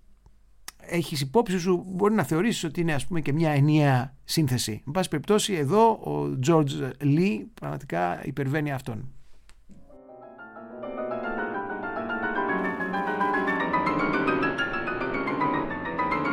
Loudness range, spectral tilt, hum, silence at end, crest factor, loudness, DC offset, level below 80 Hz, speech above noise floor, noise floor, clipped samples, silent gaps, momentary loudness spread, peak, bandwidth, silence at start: 9 LU; -5.5 dB/octave; none; 0 s; 18 dB; -26 LUFS; under 0.1%; -52 dBFS; 29 dB; -54 dBFS; under 0.1%; none; 11 LU; -8 dBFS; 16.5 kHz; 0.1 s